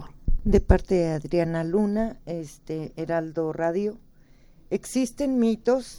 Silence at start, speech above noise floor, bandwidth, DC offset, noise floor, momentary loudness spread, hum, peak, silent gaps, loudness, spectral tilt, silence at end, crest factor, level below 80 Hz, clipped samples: 0 s; 29 dB; 16.5 kHz; under 0.1%; -53 dBFS; 12 LU; none; -4 dBFS; none; -26 LUFS; -7 dB/octave; 0 s; 22 dB; -32 dBFS; under 0.1%